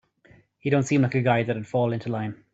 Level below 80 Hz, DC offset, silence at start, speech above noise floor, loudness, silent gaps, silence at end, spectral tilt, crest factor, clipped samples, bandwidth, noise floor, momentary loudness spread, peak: -62 dBFS; under 0.1%; 0.65 s; 33 dB; -24 LUFS; none; 0.2 s; -7 dB/octave; 18 dB; under 0.1%; 8 kHz; -57 dBFS; 9 LU; -8 dBFS